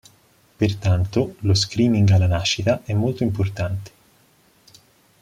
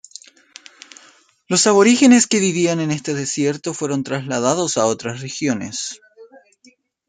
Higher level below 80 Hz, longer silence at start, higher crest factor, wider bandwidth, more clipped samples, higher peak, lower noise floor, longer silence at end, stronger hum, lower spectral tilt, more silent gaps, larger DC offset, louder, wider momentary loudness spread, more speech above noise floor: first, -46 dBFS vs -62 dBFS; second, 0.6 s vs 1.5 s; about the same, 16 dB vs 18 dB; about the same, 10.5 kHz vs 9.6 kHz; neither; second, -6 dBFS vs -2 dBFS; about the same, -57 dBFS vs -54 dBFS; first, 1.35 s vs 0.85 s; neither; first, -6 dB/octave vs -4 dB/octave; neither; neither; second, -21 LUFS vs -17 LUFS; second, 7 LU vs 14 LU; about the same, 38 dB vs 37 dB